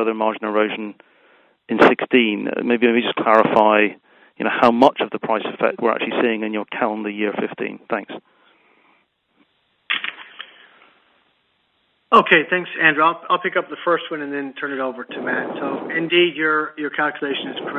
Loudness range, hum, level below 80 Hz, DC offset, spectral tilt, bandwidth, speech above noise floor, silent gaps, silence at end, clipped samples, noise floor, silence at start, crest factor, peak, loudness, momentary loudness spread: 13 LU; none; -66 dBFS; under 0.1%; -6 dB/octave; 8.4 kHz; 46 dB; none; 0 s; under 0.1%; -65 dBFS; 0 s; 20 dB; 0 dBFS; -19 LUFS; 12 LU